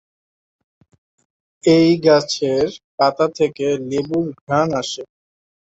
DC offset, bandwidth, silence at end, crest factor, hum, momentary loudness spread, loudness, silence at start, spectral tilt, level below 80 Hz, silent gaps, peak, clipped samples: under 0.1%; 8 kHz; 0.55 s; 18 dB; none; 10 LU; -18 LUFS; 1.65 s; -5.5 dB/octave; -56 dBFS; 2.84-2.98 s, 4.41-4.47 s; -2 dBFS; under 0.1%